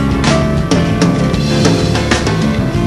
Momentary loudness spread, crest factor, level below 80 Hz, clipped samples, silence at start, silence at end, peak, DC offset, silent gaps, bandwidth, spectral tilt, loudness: 2 LU; 12 dB; -24 dBFS; under 0.1%; 0 s; 0 s; 0 dBFS; under 0.1%; none; 13 kHz; -5.5 dB/octave; -13 LUFS